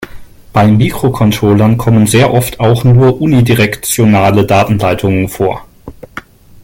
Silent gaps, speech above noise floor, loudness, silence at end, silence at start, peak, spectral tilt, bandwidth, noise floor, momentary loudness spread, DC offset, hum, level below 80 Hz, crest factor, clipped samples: none; 23 dB; -10 LUFS; 0.45 s; 0 s; 0 dBFS; -6 dB/octave; 17 kHz; -32 dBFS; 8 LU; under 0.1%; none; -34 dBFS; 10 dB; under 0.1%